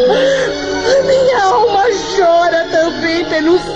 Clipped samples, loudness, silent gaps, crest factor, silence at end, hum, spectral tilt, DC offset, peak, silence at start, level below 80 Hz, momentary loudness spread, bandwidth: under 0.1%; -12 LUFS; none; 10 dB; 0 s; none; -3.5 dB/octave; 0.2%; -2 dBFS; 0 s; -40 dBFS; 4 LU; 8.8 kHz